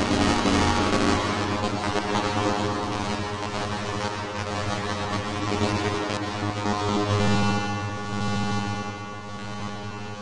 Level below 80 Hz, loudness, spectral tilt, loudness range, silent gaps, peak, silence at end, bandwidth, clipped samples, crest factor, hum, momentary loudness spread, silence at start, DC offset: -46 dBFS; -26 LUFS; -5 dB/octave; 3 LU; none; -8 dBFS; 0 s; 11.5 kHz; under 0.1%; 16 dB; none; 12 LU; 0 s; under 0.1%